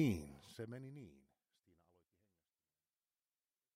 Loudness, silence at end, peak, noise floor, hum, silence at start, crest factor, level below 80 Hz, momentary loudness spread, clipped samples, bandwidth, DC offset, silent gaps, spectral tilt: -47 LUFS; 2.6 s; -24 dBFS; under -90 dBFS; none; 0 s; 24 dB; -70 dBFS; 15 LU; under 0.1%; 16 kHz; under 0.1%; none; -7 dB/octave